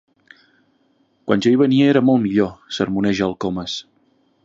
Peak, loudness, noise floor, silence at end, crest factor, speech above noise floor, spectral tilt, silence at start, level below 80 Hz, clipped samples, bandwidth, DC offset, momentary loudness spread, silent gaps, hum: -2 dBFS; -18 LUFS; -61 dBFS; 0.65 s; 18 dB; 44 dB; -6.5 dB/octave; 1.25 s; -52 dBFS; under 0.1%; 7.8 kHz; under 0.1%; 12 LU; none; none